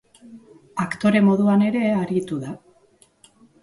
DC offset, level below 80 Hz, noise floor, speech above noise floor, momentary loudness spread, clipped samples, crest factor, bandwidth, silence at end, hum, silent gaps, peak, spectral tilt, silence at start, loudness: under 0.1%; -62 dBFS; -57 dBFS; 38 dB; 16 LU; under 0.1%; 14 dB; 11.5 kHz; 1.05 s; none; none; -8 dBFS; -7.5 dB/octave; 0.25 s; -20 LUFS